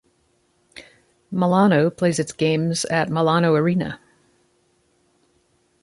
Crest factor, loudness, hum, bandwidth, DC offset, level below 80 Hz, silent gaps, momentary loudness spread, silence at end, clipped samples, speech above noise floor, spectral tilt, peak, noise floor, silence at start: 18 dB; -20 LUFS; none; 11.5 kHz; under 0.1%; -60 dBFS; none; 9 LU; 1.85 s; under 0.1%; 45 dB; -6 dB/octave; -4 dBFS; -64 dBFS; 0.75 s